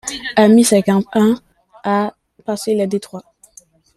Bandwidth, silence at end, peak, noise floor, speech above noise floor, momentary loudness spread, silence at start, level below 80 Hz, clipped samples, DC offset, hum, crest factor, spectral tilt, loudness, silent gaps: 13.5 kHz; 0.75 s; -2 dBFS; -48 dBFS; 34 dB; 16 LU; 0.05 s; -56 dBFS; under 0.1%; under 0.1%; none; 16 dB; -5 dB/octave; -16 LUFS; none